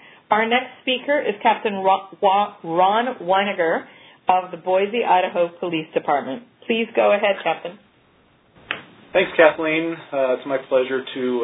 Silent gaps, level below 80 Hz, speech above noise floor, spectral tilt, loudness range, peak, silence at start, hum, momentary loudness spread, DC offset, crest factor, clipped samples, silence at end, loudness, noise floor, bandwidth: none; -66 dBFS; 37 dB; -8.5 dB/octave; 3 LU; 0 dBFS; 0.3 s; none; 9 LU; under 0.1%; 20 dB; under 0.1%; 0 s; -20 LUFS; -57 dBFS; 4 kHz